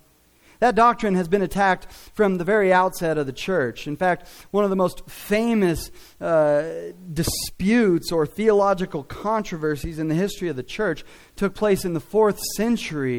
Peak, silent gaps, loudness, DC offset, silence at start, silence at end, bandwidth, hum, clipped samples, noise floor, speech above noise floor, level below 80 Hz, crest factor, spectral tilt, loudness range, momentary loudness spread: -6 dBFS; none; -22 LUFS; under 0.1%; 0.6 s; 0 s; 19.5 kHz; none; under 0.1%; -56 dBFS; 35 dB; -44 dBFS; 16 dB; -5.5 dB/octave; 3 LU; 10 LU